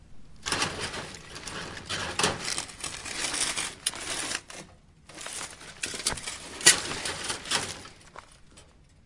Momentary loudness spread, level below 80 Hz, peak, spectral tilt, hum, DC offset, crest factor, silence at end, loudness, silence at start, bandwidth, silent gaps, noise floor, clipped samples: 15 LU; -56 dBFS; 0 dBFS; -0.5 dB/octave; none; under 0.1%; 32 dB; 0.35 s; -28 LUFS; 0 s; 11.5 kHz; none; -55 dBFS; under 0.1%